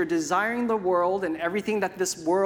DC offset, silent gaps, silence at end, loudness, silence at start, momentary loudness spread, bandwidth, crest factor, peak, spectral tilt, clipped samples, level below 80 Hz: under 0.1%; none; 0 s; -26 LUFS; 0 s; 4 LU; 18 kHz; 14 dB; -12 dBFS; -4 dB/octave; under 0.1%; -64 dBFS